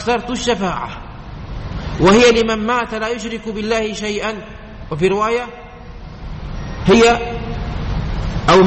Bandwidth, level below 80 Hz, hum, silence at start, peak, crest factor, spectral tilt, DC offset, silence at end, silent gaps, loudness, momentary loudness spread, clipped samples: 8.6 kHz; -30 dBFS; none; 0 s; -2 dBFS; 14 dB; -5 dB/octave; under 0.1%; 0 s; none; -17 LUFS; 22 LU; under 0.1%